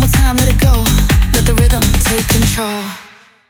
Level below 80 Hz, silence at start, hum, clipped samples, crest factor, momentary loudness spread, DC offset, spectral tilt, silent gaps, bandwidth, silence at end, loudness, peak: -14 dBFS; 0 s; none; under 0.1%; 12 dB; 9 LU; under 0.1%; -4.5 dB/octave; none; over 20 kHz; 0.45 s; -12 LUFS; 0 dBFS